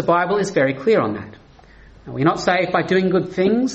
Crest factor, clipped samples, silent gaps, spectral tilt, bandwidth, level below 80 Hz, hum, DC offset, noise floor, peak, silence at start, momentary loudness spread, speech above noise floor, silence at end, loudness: 16 dB; under 0.1%; none; -6 dB/octave; 8.4 kHz; -52 dBFS; none; under 0.1%; -46 dBFS; -4 dBFS; 0 s; 9 LU; 28 dB; 0 s; -18 LUFS